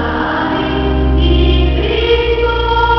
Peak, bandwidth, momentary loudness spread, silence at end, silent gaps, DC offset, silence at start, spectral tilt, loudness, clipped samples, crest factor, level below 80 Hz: 0 dBFS; 5.8 kHz; 4 LU; 0 s; none; under 0.1%; 0 s; -8 dB/octave; -13 LUFS; under 0.1%; 12 dB; -16 dBFS